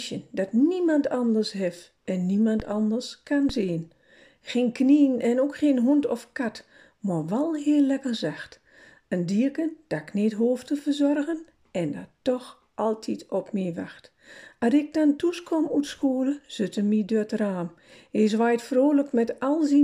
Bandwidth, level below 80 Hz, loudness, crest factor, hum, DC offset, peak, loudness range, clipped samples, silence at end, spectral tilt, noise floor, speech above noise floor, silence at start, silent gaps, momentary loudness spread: 11 kHz; -58 dBFS; -25 LUFS; 16 dB; none; under 0.1%; -10 dBFS; 4 LU; under 0.1%; 0 s; -6.5 dB/octave; -55 dBFS; 30 dB; 0 s; none; 11 LU